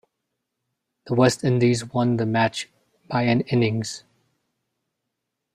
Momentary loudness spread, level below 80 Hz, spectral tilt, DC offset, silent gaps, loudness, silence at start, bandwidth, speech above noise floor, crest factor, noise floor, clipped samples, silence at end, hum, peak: 13 LU; -60 dBFS; -6 dB/octave; under 0.1%; none; -22 LUFS; 1.05 s; 13 kHz; 60 dB; 20 dB; -81 dBFS; under 0.1%; 1.55 s; none; -4 dBFS